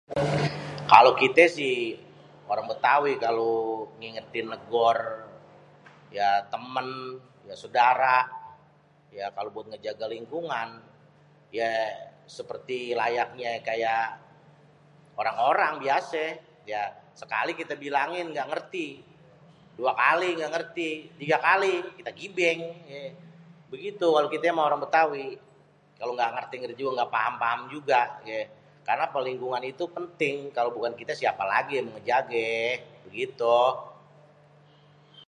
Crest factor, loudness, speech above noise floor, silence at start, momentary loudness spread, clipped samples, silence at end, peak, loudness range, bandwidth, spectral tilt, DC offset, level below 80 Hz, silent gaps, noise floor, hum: 28 dB; -26 LUFS; 33 dB; 0.1 s; 17 LU; under 0.1%; 0.1 s; 0 dBFS; 6 LU; 11 kHz; -5 dB/octave; under 0.1%; -68 dBFS; none; -59 dBFS; none